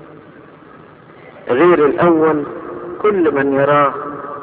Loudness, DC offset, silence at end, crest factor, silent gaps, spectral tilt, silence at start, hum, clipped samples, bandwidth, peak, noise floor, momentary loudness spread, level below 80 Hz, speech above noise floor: -14 LUFS; under 0.1%; 0 s; 16 dB; none; -10.5 dB/octave; 0 s; none; under 0.1%; 4 kHz; 0 dBFS; -40 dBFS; 15 LU; -54 dBFS; 28 dB